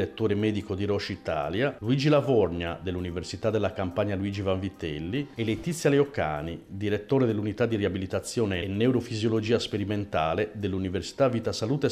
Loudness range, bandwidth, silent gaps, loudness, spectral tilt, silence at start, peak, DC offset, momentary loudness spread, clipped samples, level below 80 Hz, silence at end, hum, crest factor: 2 LU; 14.5 kHz; none; -28 LUFS; -6.5 dB/octave; 0 s; -12 dBFS; under 0.1%; 8 LU; under 0.1%; -52 dBFS; 0 s; none; 16 dB